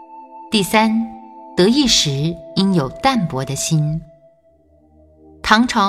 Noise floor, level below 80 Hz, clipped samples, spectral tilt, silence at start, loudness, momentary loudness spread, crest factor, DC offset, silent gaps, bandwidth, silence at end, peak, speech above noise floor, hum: -54 dBFS; -44 dBFS; under 0.1%; -4 dB/octave; 0 s; -17 LUFS; 12 LU; 18 dB; under 0.1%; none; 15 kHz; 0 s; 0 dBFS; 38 dB; none